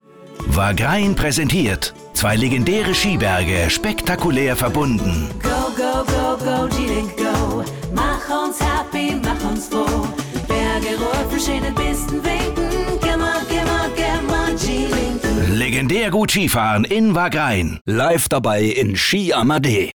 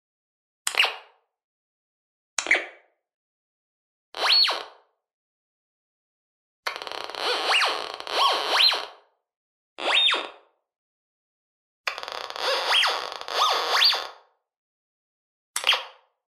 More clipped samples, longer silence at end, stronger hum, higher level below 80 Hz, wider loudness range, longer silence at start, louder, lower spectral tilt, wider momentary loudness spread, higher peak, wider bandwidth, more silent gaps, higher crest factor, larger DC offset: neither; second, 0.05 s vs 0.35 s; neither; first, -30 dBFS vs -78 dBFS; about the same, 4 LU vs 5 LU; second, 0.15 s vs 0.65 s; first, -18 LUFS vs -22 LUFS; first, -4.5 dB/octave vs 2 dB/octave; second, 5 LU vs 15 LU; second, -8 dBFS vs 0 dBFS; first, over 20 kHz vs 14.5 kHz; second, 17.81-17.85 s vs 1.44-2.37 s, 3.14-4.12 s, 5.14-6.63 s, 9.37-9.76 s, 10.78-11.84 s, 14.57-15.54 s; second, 10 dB vs 28 dB; neither